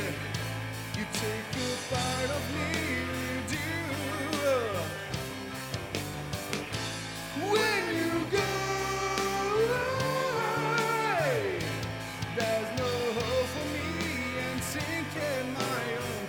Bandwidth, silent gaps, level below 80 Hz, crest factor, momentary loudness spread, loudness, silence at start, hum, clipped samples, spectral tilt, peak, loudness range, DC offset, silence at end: 19 kHz; none; -52 dBFS; 20 dB; 8 LU; -31 LUFS; 0 s; none; under 0.1%; -4 dB/octave; -12 dBFS; 4 LU; under 0.1%; 0 s